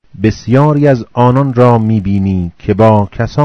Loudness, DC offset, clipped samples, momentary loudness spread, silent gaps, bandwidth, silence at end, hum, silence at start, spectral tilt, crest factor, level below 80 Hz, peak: -11 LUFS; under 0.1%; 2%; 7 LU; none; 6.6 kHz; 0 s; none; 0.2 s; -9 dB/octave; 10 dB; -36 dBFS; 0 dBFS